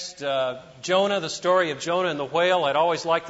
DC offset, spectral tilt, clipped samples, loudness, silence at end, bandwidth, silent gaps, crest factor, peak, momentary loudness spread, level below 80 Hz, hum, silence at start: under 0.1%; -3.5 dB/octave; under 0.1%; -23 LUFS; 0 s; 8 kHz; none; 16 dB; -8 dBFS; 6 LU; -66 dBFS; none; 0 s